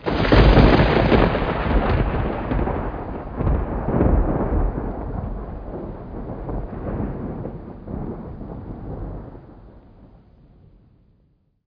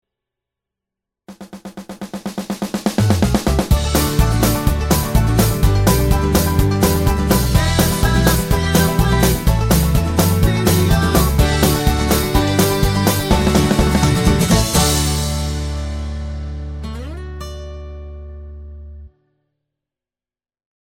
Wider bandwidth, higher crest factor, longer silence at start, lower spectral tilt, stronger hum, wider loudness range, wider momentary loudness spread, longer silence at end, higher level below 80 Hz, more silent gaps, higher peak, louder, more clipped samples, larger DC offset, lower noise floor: second, 5.2 kHz vs 17 kHz; about the same, 20 dB vs 16 dB; second, 0 s vs 1.3 s; first, -9 dB/octave vs -5 dB/octave; neither; first, 17 LU vs 14 LU; about the same, 19 LU vs 17 LU; about the same, 1.85 s vs 1.85 s; about the same, -26 dBFS vs -22 dBFS; neither; about the same, 0 dBFS vs 0 dBFS; second, -21 LUFS vs -16 LUFS; neither; neither; second, -61 dBFS vs under -90 dBFS